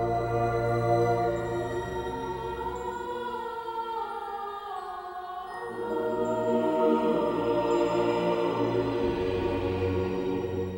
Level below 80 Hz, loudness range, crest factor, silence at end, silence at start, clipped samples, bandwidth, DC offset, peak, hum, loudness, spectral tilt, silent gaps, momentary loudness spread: -50 dBFS; 8 LU; 16 dB; 0 s; 0 s; under 0.1%; 16 kHz; under 0.1%; -12 dBFS; none; -29 LUFS; -7.5 dB/octave; none; 11 LU